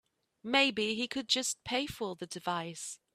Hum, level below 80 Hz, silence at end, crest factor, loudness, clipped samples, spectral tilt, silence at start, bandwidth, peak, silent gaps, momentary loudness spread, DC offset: none; -68 dBFS; 0.2 s; 22 dB; -32 LUFS; under 0.1%; -2 dB/octave; 0.45 s; 15.5 kHz; -14 dBFS; none; 12 LU; under 0.1%